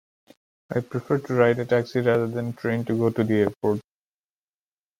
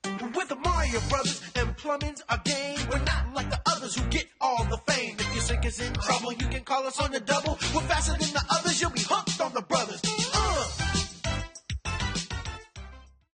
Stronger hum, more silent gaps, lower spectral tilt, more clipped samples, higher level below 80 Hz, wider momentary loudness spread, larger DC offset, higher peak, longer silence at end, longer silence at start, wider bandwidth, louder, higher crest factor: neither; first, 3.57-3.61 s vs none; first, -8 dB/octave vs -3.5 dB/octave; neither; second, -64 dBFS vs -36 dBFS; about the same, 8 LU vs 7 LU; neither; first, -6 dBFS vs -10 dBFS; first, 1.2 s vs 0.3 s; first, 0.7 s vs 0.05 s; first, 16 kHz vs 9.8 kHz; first, -24 LUFS vs -28 LUFS; about the same, 20 dB vs 18 dB